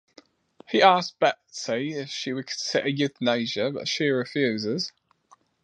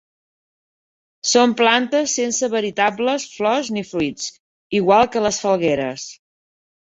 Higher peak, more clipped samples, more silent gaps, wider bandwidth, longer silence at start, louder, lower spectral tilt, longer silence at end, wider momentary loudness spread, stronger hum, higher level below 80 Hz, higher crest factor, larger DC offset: about the same, -2 dBFS vs -2 dBFS; neither; second, none vs 4.40-4.70 s; first, 10 kHz vs 8 kHz; second, 0.7 s vs 1.25 s; second, -25 LUFS vs -18 LUFS; about the same, -4 dB/octave vs -3 dB/octave; about the same, 0.75 s vs 0.8 s; about the same, 11 LU vs 10 LU; neither; second, -74 dBFS vs -56 dBFS; first, 24 dB vs 18 dB; neither